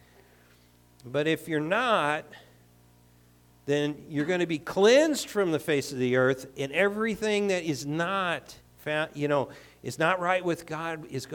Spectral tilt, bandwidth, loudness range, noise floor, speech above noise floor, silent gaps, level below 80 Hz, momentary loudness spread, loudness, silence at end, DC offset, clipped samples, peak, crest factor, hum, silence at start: -4.5 dB/octave; 18 kHz; 5 LU; -59 dBFS; 32 dB; none; -64 dBFS; 10 LU; -27 LUFS; 0 s; under 0.1%; under 0.1%; -8 dBFS; 20 dB; 60 Hz at -60 dBFS; 1.05 s